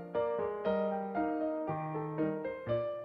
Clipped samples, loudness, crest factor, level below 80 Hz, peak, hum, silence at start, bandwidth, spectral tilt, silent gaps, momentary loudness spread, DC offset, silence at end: under 0.1%; -35 LUFS; 14 dB; -66 dBFS; -20 dBFS; none; 0 s; 5.4 kHz; -10 dB/octave; none; 4 LU; under 0.1%; 0 s